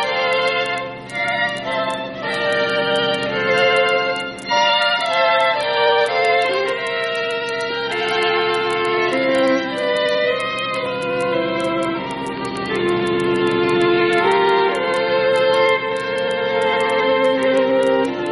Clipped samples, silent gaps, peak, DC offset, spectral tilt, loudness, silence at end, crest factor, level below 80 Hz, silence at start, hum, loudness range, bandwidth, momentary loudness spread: under 0.1%; none; -4 dBFS; under 0.1%; -4.5 dB/octave; -18 LUFS; 0 s; 14 dB; -54 dBFS; 0 s; none; 3 LU; 11.5 kHz; 7 LU